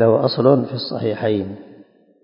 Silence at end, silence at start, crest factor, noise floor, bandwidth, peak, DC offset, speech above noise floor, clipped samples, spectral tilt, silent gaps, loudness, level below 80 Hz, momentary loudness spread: 0.5 s; 0 s; 18 dB; -48 dBFS; 5.4 kHz; 0 dBFS; under 0.1%; 31 dB; under 0.1%; -11.5 dB/octave; none; -18 LUFS; -56 dBFS; 12 LU